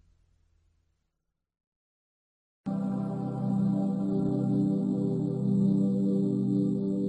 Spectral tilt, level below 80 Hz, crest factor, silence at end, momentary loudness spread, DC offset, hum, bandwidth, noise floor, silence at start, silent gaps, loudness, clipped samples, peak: -11 dB/octave; -64 dBFS; 14 dB; 0 s; 6 LU; under 0.1%; none; 8.4 kHz; -83 dBFS; 2.65 s; none; -28 LUFS; under 0.1%; -16 dBFS